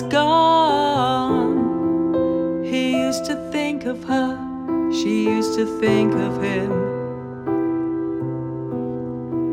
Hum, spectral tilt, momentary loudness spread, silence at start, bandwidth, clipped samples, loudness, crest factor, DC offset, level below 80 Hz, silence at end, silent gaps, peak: none; -6 dB/octave; 10 LU; 0 s; 14 kHz; under 0.1%; -21 LUFS; 14 dB; under 0.1%; -52 dBFS; 0 s; none; -6 dBFS